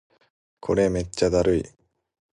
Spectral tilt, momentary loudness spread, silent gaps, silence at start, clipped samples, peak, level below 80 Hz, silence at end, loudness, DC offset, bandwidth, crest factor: -6 dB/octave; 12 LU; none; 0.65 s; under 0.1%; -6 dBFS; -42 dBFS; 0.7 s; -23 LUFS; under 0.1%; 11.5 kHz; 20 dB